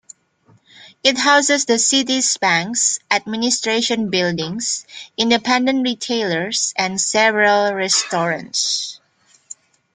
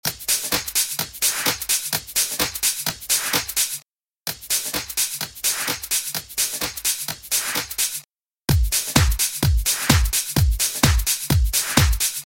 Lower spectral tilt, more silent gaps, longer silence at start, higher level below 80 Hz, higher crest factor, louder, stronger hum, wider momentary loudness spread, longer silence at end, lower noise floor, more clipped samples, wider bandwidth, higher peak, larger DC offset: about the same, -2 dB/octave vs -2.5 dB/octave; second, none vs 3.92-3.96 s; first, 0.8 s vs 0.05 s; second, -64 dBFS vs -28 dBFS; about the same, 18 dB vs 22 dB; first, -17 LUFS vs -20 LUFS; neither; about the same, 7 LU vs 6 LU; first, 0.4 s vs 0 s; first, -57 dBFS vs -51 dBFS; neither; second, 10 kHz vs 17 kHz; about the same, -2 dBFS vs 0 dBFS; neither